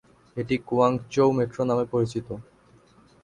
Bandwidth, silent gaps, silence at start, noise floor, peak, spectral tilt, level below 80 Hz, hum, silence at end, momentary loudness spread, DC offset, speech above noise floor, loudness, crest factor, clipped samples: 11 kHz; none; 0.35 s; -57 dBFS; -6 dBFS; -7.5 dB/octave; -58 dBFS; none; 0.8 s; 15 LU; under 0.1%; 33 dB; -25 LUFS; 20 dB; under 0.1%